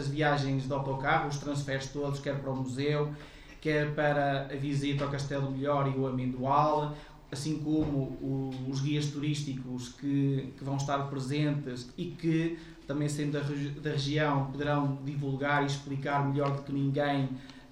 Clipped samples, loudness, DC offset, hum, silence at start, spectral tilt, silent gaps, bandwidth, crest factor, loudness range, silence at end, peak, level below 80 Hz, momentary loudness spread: under 0.1%; -32 LUFS; under 0.1%; none; 0 s; -6.5 dB/octave; none; 10.5 kHz; 18 dB; 2 LU; 0 s; -12 dBFS; -54 dBFS; 8 LU